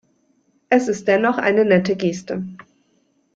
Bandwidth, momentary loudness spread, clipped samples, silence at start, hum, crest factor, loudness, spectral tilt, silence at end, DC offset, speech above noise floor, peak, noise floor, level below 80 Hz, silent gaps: 7.8 kHz; 13 LU; under 0.1%; 0.7 s; none; 18 dB; -18 LUFS; -6 dB/octave; 0.8 s; under 0.1%; 45 dB; -2 dBFS; -63 dBFS; -62 dBFS; none